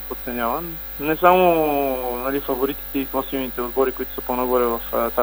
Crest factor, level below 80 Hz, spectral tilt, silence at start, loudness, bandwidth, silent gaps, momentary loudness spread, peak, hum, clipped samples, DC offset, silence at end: 20 dB; -40 dBFS; -6 dB/octave; 0 s; -21 LUFS; over 20 kHz; none; 10 LU; 0 dBFS; none; under 0.1%; under 0.1%; 0 s